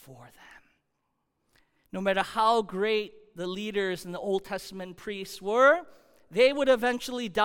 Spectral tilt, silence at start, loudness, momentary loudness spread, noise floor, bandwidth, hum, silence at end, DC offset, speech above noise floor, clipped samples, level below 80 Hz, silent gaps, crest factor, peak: -4.5 dB/octave; 0.1 s; -27 LUFS; 16 LU; -78 dBFS; 17 kHz; none; 0 s; under 0.1%; 51 dB; under 0.1%; -62 dBFS; none; 18 dB; -10 dBFS